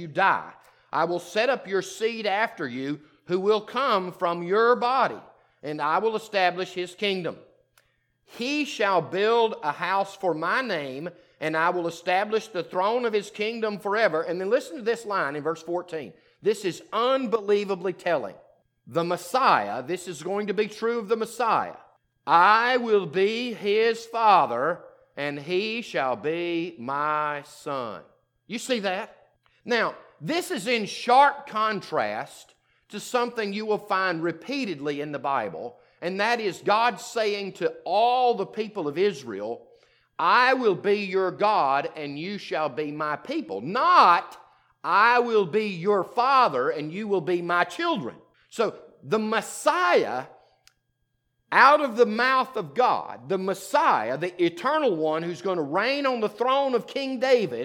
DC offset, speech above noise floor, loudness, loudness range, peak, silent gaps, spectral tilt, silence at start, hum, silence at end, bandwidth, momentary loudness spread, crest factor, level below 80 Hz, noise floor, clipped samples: under 0.1%; 50 dB; -25 LUFS; 6 LU; -2 dBFS; none; -4.5 dB/octave; 0 s; none; 0 s; 17.5 kHz; 13 LU; 22 dB; -78 dBFS; -74 dBFS; under 0.1%